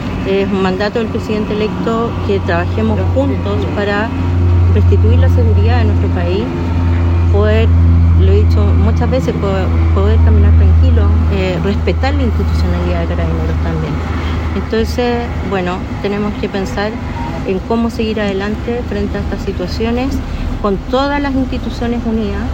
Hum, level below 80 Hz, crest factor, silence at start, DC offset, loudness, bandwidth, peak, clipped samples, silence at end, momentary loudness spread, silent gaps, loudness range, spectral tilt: none; -22 dBFS; 12 dB; 0 s; under 0.1%; -14 LUFS; 7.6 kHz; 0 dBFS; under 0.1%; 0 s; 8 LU; none; 6 LU; -8 dB/octave